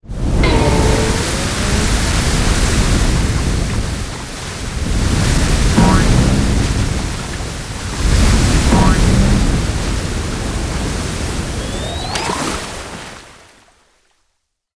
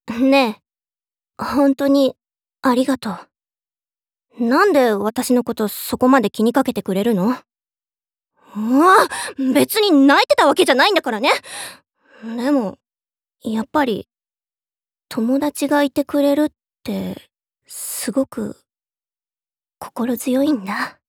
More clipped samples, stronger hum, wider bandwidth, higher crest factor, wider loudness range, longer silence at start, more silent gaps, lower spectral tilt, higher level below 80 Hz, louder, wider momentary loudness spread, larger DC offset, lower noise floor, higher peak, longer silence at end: neither; neither; second, 11 kHz vs 18.5 kHz; about the same, 16 dB vs 18 dB; about the same, 7 LU vs 9 LU; about the same, 0.05 s vs 0.05 s; neither; about the same, -5 dB/octave vs -4 dB/octave; first, -18 dBFS vs -62 dBFS; about the same, -16 LUFS vs -17 LUFS; second, 11 LU vs 17 LU; neither; second, -68 dBFS vs under -90 dBFS; about the same, 0 dBFS vs -2 dBFS; first, 1.45 s vs 0.2 s